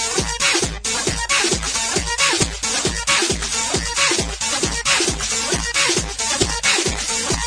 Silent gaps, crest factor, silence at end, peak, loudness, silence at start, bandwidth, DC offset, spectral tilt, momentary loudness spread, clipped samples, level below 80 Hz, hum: none; 18 dB; 0 s; -2 dBFS; -18 LUFS; 0 s; 10.5 kHz; under 0.1%; -1.5 dB/octave; 4 LU; under 0.1%; -34 dBFS; none